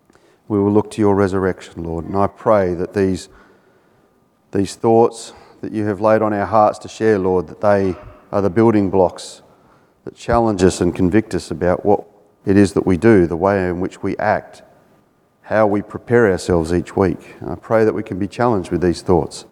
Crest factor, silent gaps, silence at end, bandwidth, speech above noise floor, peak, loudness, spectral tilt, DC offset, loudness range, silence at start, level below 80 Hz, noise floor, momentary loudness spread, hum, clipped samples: 18 dB; none; 0.1 s; 12 kHz; 41 dB; 0 dBFS; -17 LUFS; -7 dB/octave; under 0.1%; 3 LU; 0.5 s; -44 dBFS; -57 dBFS; 12 LU; none; under 0.1%